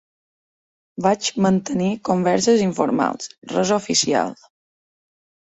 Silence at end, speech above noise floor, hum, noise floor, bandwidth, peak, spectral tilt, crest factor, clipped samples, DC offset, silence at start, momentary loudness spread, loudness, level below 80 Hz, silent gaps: 1.25 s; over 71 dB; none; under -90 dBFS; 8.2 kHz; -2 dBFS; -4.5 dB/octave; 20 dB; under 0.1%; under 0.1%; 1 s; 7 LU; -20 LUFS; -60 dBFS; 3.38-3.42 s